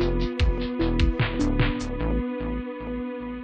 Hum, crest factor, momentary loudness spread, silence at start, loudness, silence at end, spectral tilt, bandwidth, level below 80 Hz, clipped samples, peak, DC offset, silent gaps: none; 14 dB; 8 LU; 0 s; -27 LUFS; 0 s; -7 dB/octave; 8.8 kHz; -28 dBFS; under 0.1%; -10 dBFS; under 0.1%; none